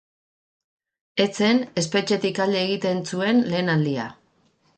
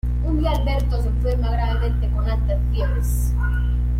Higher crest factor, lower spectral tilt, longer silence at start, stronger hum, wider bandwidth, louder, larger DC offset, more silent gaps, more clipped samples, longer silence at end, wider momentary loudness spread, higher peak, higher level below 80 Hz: first, 18 dB vs 10 dB; second, -5 dB/octave vs -7 dB/octave; first, 1.15 s vs 0.05 s; second, none vs 60 Hz at -20 dBFS; second, 9.2 kHz vs 14 kHz; about the same, -22 LUFS vs -22 LUFS; neither; neither; neither; first, 0.65 s vs 0 s; first, 6 LU vs 1 LU; first, -6 dBFS vs -10 dBFS; second, -66 dBFS vs -20 dBFS